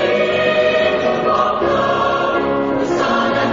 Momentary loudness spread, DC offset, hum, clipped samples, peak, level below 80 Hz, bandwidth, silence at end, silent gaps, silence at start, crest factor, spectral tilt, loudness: 3 LU; under 0.1%; none; under 0.1%; -2 dBFS; -46 dBFS; 7.6 kHz; 0 s; none; 0 s; 14 dB; -5.5 dB/octave; -16 LUFS